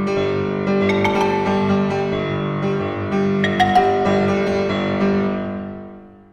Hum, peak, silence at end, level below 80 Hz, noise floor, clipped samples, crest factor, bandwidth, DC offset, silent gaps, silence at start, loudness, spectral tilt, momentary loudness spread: 50 Hz at -40 dBFS; -2 dBFS; 0.2 s; -46 dBFS; -39 dBFS; under 0.1%; 16 dB; 11.5 kHz; under 0.1%; none; 0 s; -19 LUFS; -7 dB/octave; 7 LU